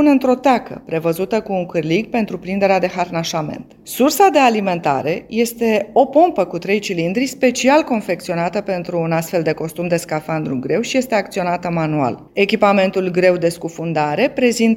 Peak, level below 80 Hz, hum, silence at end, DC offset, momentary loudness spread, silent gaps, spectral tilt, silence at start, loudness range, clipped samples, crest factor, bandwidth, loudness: 0 dBFS; -54 dBFS; none; 0 s; under 0.1%; 8 LU; none; -5.5 dB/octave; 0 s; 4 LU; under 0.1%; 16 dB; 17 kHz; -17 LUFS